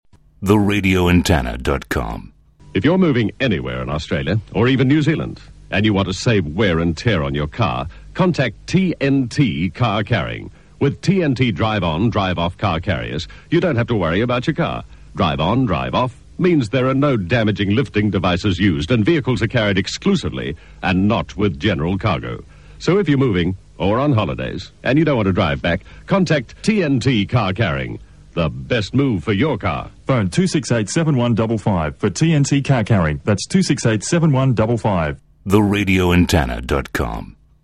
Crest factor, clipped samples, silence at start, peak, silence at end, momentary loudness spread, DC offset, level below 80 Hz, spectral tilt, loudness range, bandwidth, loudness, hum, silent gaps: 16 dB; under 0.1%; 0.4 s; 0 dBFS; 0.4 s; 8 LU; 0.2%; -36 dBFS; -6 dB/octave; 2 LU; 14 kHz; -18 LUFS; none; none